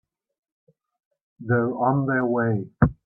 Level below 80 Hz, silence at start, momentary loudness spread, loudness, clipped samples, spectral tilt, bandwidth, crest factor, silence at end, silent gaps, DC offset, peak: -44 dBFS; 1.4 s; 4 LU; -23 LUFS; under 0.1%; -13.5 dB/octave; 2.5 kHz; 20 dB; 0.1 s; none; under 0.1%; -4 dBFS